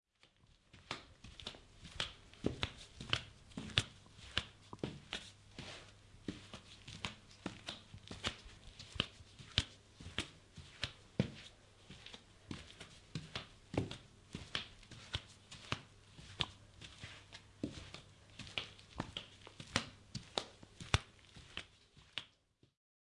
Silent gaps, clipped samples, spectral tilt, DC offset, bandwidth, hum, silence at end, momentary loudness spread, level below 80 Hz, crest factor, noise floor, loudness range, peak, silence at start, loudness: none; under 0.1%; -3.5 dB/octave; under 0.1%; 11.5 kHz; none; 0.7 s; 17 LU; -60 dBFS; 38 dB; -73 dBFS; 6 LU; -8 dBFS; 0.25 s; -45 LUFS